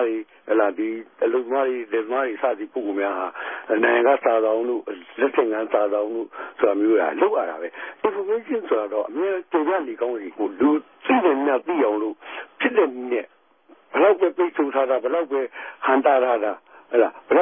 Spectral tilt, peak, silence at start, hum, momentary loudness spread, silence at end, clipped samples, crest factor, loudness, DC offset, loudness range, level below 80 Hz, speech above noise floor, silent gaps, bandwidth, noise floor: -8.5 dB/octave; -4 dBFS; 0 s; none; 10 LU; 0 s; under 0.1%; 16 dB; -22 LUFS; under 0.1%; 3 LU; -74 dBFS; 33 dB; none; 3.6 kHz; -55 dBFS